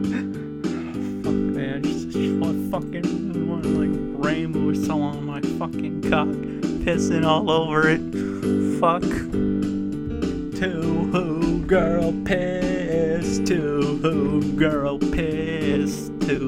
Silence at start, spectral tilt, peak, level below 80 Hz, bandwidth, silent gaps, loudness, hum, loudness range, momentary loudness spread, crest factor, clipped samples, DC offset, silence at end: 0 s; -6.5 dB/octave; -4 dBFS; -40 dBFS; 15.5 kHz; none; -23 LUFS; none; 3 LU; 7 LU; 18 dB; under 0.1%; under 0.1%; 0 s